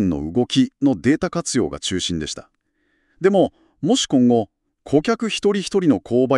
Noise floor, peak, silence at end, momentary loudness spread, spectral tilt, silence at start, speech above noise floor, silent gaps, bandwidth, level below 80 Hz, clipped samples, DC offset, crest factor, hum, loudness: -67 dBFS; -4 dBFS; 0 s; 7 LU; -5 dB/octave; 0 s; 48 dB; none; 11.5 kHz; -48 dBFS; under 0.1%; under 0.1%; 16 dB; none; -19 LUFS